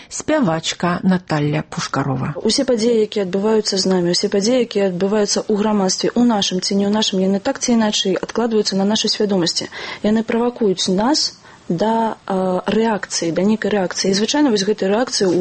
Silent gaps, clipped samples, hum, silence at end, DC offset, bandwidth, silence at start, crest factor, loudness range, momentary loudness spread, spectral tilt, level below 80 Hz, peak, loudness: none; under 0.1%; none; 0 s; under 0.1%; 8.8 kHz; 0 s; 12 dB; 2 LU; 5 LU; -4.5 dB/octave; -52 dBFS; -6 dBFS; -17 LUFS